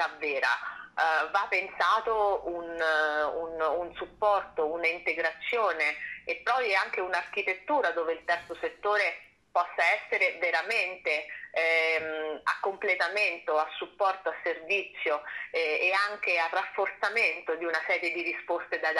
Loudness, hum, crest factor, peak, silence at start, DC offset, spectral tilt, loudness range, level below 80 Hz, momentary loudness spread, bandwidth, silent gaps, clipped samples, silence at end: -28 LUFS; none; 18 dB; -12 dBFS; 0 s; under 0.1%; -2 dB/octave; 2 LU; -68 dBFS; 7 LU; 12.5 kHz; none; under 0.1%; 0 s